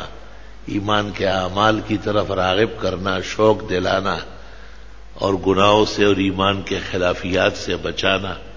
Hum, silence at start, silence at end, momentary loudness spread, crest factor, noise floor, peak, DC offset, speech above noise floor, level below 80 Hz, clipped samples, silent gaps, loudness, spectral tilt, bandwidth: none; 0 s; 0 s; 9 LU; 20 dB; -40 dBFS; 0 dBFS; 1%; 22 dB; -38 dBFS; under 0.1%; none; -19 LUFS; -5 dB/octave; 7.6 kHz